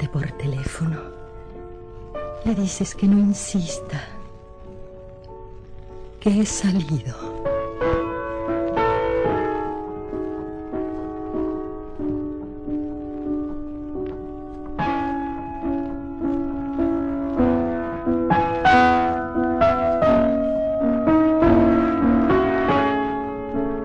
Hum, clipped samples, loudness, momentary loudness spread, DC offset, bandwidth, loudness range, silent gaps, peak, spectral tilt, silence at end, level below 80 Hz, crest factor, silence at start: none; under 0.1%; -22 LUFS; 21 LU; under 0.1%; 10 kHz; 10 LU; none; -4 dBFS; -6 dB/octave; 0 s; -38 dBFS; 18 dB; 0 s